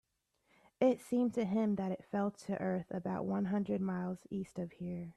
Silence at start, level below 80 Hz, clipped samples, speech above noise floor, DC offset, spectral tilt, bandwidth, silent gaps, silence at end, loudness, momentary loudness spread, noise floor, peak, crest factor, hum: 0.8 s; -72 dBFS; under 0.1%; 42 dB; under 0.1%; -8 dB/octave; 12.5 kHz; none; 0.05 s; -37 LUFS; 9 LU; -78 dBFS; -18 dBFS; 18 dB; none